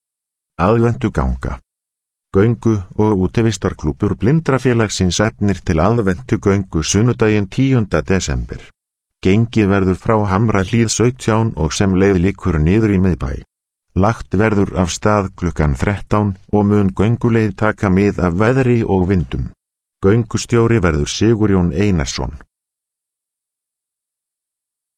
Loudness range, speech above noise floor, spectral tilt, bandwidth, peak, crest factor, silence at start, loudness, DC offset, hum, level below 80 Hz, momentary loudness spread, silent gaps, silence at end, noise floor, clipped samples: 3 LU; 69 dB; -6.5 dB/octave; 10.5 kHz; 0 dBFS; 16 dB; 0.6 s; -16 LUFS; under 0.1%; none; -32 dBFS; 6 LU; none; 2.55 s; -84 dBFS; under 0.1%